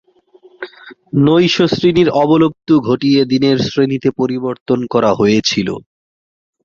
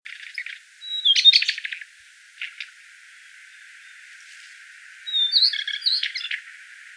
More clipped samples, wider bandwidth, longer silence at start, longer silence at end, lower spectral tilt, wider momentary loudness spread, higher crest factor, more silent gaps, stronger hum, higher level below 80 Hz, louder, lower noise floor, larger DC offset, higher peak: neither; second, 7.4 kHz vs 11 kHz; first, 0.6 s vs 0.05 s; first, 0.85 s vs 0 s; first, -6 dB/octave vs 10 dB/octave; second, 11 LU vs 24 LU; second, 14 dB vs 24 dB; first, 4.60-4.66 s vs none; neither; first, -48 dBFS vs -88 dBFS; first, -13 LUFS vs -18 LUFS; about the same, -47 dBFS vs -50 dBFS; neither; about the same, 0 dBFS vs -2 dBFS